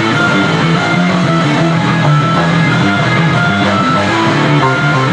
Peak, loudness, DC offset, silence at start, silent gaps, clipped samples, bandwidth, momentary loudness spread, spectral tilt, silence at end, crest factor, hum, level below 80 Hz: 0 dBFS; -11 LUFS; under 0.1%; 0 s; none; under 0.1%; 10 kHz; 1 LU; -6 dB/octave; 0 s; 10 dB; none; -46 dBFS